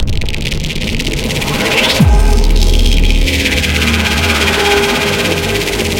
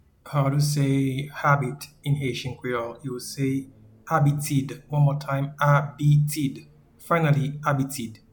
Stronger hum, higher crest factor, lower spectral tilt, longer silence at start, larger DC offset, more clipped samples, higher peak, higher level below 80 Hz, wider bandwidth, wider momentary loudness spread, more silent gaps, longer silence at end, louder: neither; about the same, 12 dB vs 16 dB; second, -4 dB/octave vs -6.5 dB/octave; second, 0 s vs 0.25 s; neither; neither; first, 0 dBFS vs -8 dBFS; first, -14 dBFS vs -56 dBFS; second, 17 kHz vs 19 kHz; second, 7 LU vs 10 LU; neither; second, 0 s vs 0.15 s; first, -12 LUFS vs -25 LUFS